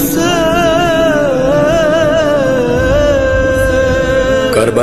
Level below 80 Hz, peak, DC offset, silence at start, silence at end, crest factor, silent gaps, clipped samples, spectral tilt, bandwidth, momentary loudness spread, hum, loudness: -24 dBFS; 0 dBFS; 2%; 0 s; 0 s; 10 dB; none; under 0.1%; -5 dB/octave; 13.5 kHz; 1 LU; none; -11 LUFS